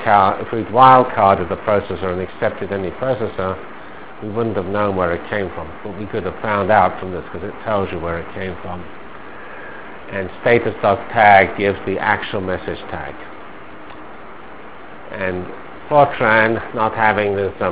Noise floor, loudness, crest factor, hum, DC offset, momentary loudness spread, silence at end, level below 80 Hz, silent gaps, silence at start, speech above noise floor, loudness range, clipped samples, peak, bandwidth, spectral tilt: -37 dBFS; -17 LUFS; 18 dB; none; 2%; 23 LU; 0 s; -42 dBFS; none; 0 s; 20 dB; 9 LU; under 0.1%; 0 dBFS; 4 kHz; -9.5 dB/octave